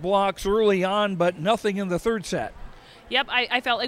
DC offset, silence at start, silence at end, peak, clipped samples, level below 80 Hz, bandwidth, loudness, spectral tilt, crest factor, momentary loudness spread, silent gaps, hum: under 0.1%; 0 s; 0 s; -6 dBFS; under 0.1%; -46 dBFS; 15.5 kHz; -23 LUFS; -4.5 dB/octave; 18 dB; 6 LU; none; none